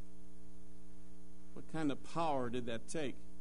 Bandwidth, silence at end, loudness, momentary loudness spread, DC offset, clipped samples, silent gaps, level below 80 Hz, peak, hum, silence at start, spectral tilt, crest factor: 10.5 kHz; 0 s; -41 LUFS; 23 LU; 1%; under 0.1%; none; -62 dBFS; -26 dBFS; none; 0 s; -5.5 dB/octave; 20 dB